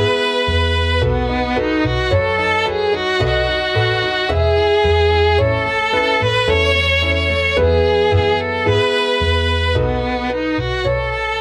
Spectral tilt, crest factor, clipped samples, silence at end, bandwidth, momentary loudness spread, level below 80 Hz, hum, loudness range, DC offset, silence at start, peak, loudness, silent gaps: -5.5 dB/octave; 12 dB; under 0.1%; 0 s; 10.5 kHz; 5 LU; -26 dBFS; none; 2 LU; under 0.1%; 0 s; -4 dBFS; -16 LUFS; none